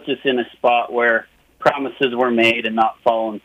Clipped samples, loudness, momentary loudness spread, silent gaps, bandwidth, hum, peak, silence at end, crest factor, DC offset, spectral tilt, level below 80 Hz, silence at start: under 0.1%; -18 LUFS; 5 LU; none; 15 kHz; none; -2 dBFS; 0.05 s; 16 dB; under 0.1%; -5 dB/octave; -62 dBFS; 0.05 s